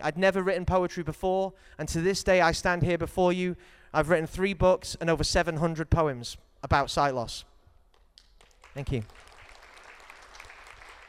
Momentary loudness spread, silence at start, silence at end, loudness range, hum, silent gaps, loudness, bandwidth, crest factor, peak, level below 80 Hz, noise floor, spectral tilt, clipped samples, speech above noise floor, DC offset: 22 LU; 0 s; 0 s; 15 LU; none; none; -27 LUFS; 15.5 kHz; 20 dB; -8 dBFS; -44 dBFS; -60 dBFS; -5 dB/octave; under 0.1%; 33 dB; under 0.1%